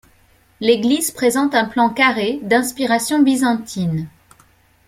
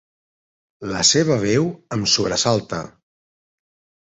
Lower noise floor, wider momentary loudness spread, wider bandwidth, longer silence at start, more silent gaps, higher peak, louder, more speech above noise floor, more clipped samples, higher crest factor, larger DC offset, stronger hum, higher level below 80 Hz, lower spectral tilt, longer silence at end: second, -54 dBFS vs under -90 dBFS; second, 8 LU vs 15 LU; first, 16 kHz vs 8.4 kHz; second, 0.6 s vs 0.8 s; neither; about the same, -2 dBFS vs -2 dBFS; about the same, -17 LUFS vs -18 LUFS; second, 37 dB vs over 71 dB; neither; about the same, 16 dB vs 20 dB; neither; neither; about the same, -56 dBFS vs -52 dBFS; about the same, -4 dB/octave vs -3.5 dB/octave; second, 0.8 s vs 1.15 s